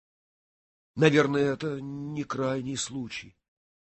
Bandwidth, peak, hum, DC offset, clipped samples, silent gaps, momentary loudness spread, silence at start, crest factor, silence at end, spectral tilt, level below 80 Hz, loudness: 8.6 kHz; -8 dBFS; none; under 0.1%; under 0.1%; none; 15 LU; 0.95 s; 22 dB; 0.65 s; -5.5 dB/octave; -64 dBFS; -28 LUFS